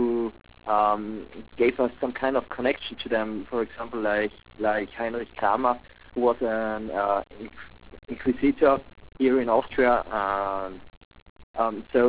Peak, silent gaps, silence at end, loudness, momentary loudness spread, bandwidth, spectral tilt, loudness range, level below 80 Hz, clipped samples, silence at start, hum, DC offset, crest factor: -8 dBFS; 10.97-11.11 s, 11.22-11.36 s, 11.43-11.54 s; 0 s; -26 LUFS; 16 LU; 4 kHz; -9 dB/octave; 3 LU; -52 dBFS; under 0.1%; 0 s; none; 0.3%; 18 dB